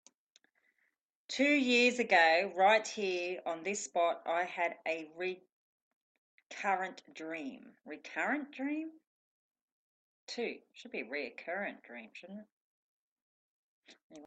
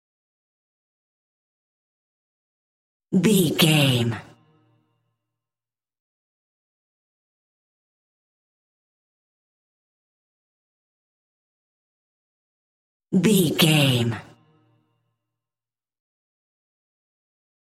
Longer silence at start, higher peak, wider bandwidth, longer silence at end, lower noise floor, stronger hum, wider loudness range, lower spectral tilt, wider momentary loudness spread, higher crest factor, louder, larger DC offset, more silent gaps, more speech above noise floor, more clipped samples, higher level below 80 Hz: second, 1.3 s vs 3.1 s; second, -14 dBFS vs -4 dBFS; second, 9 kHz vs 16 kHz; second, 0 s vs 3.4 s; second, -80 dBFS vs under -90 dBFS; neither; first, 13 LU vs 8 LU; second, -2.5 dB/octave vs -5 dB/octave; first, 22 LU vs 11 LU; about the same, 22 dB vs 24 dB; second, -33 LUFS vs -19 LUFS; neither; second, 5.52-6.38 s, 6.46-6.50 s, 9.07-9.51 s, 9.61-10.27 s, 12.52-13.82 s, 14.03-14.10 s vs 6.00-13.00 s; second, 46 dB vs over 71 dB; neither; second, -86 dBFS vs -66 dBFS